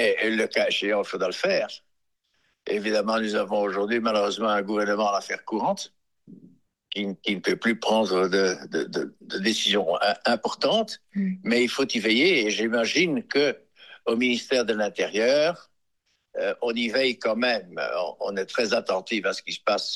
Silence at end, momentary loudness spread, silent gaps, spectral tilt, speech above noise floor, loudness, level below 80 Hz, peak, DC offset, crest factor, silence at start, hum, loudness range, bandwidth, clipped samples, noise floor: 0 s; 8 LU; none; -3.5 dB/octave; 50 dB; -25 LUFS; -74 dBFS; -8 dBFS; under 0.1%; 16 dB; 0 s; none; 4 LU; 12.5 kHz; under 0.1%; -74 dBFS